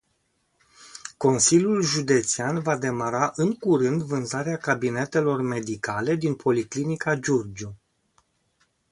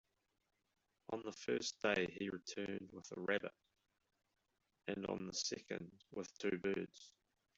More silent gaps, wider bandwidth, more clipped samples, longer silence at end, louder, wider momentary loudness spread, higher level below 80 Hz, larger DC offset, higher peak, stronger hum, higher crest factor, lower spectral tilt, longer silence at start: neither; first, 11.5 kHz vs 8 kHz; neither; first, 1.15 s vs 0.5 s; first, -24 LUFS vs -44 LUFS; second, 9 LU vs 13 LU; first, -62 dBFS vs -78 dBFS; neither; first, -6 dBFS vs -22 dBFS; neither; about the same, 20 dB vs 24 dB; first, -4.5 dB/octave vs -3 dB/octave; second, 0.8 s vs 1.1 s